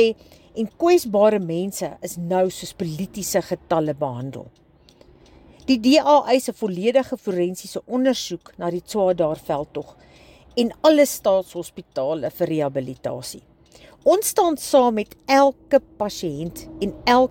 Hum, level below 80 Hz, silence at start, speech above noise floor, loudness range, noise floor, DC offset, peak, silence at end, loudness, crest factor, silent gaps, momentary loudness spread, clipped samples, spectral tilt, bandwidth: none; -54 dBFS; 0 s; 31 dB; 5 LU; -52 dBFS; under 0.1%; -4 dBFS; 0 s; -21 LUFS; 18 dB; none; 15 LU; under 0.1%; -4.5 dB/octave; 17 kHz